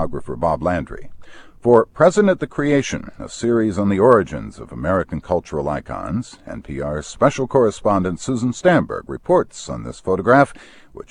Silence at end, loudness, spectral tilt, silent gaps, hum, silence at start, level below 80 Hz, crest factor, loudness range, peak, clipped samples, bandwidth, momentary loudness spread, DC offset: 0.1 s; -19 LUFS; -6.5 dB/octave; none; none; 0 s; -42 dBFS; 18 dB; 4 LU; 0 dBFS; under 0.1%; 10.5 kHz; 15 LU; under 0.1%